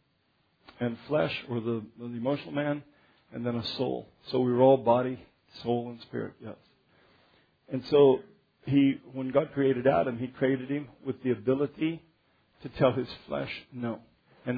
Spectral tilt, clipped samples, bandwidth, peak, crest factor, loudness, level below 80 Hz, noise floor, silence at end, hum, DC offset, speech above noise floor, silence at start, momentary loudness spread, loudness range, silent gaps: -9 dB/octave; under 0.1%; 5 kHz; -10 dBFS; 20 dB; -29 LUFS; -64 dBFS; -71 dBFS; 0 s; none; under 0.1%; 43 dB; 0.8 s; 16 LU; 6 LU; none